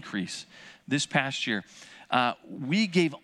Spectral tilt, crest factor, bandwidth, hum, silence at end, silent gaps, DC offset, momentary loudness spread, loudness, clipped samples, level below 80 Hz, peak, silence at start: -4.5 dB/octave; 22 dB; 12 kHz; none; 0.05 s; none; under 0.1%; 22 LU; -28 LUFS; under 0.1%; -76 dBFS; -6 dBFS; 0 s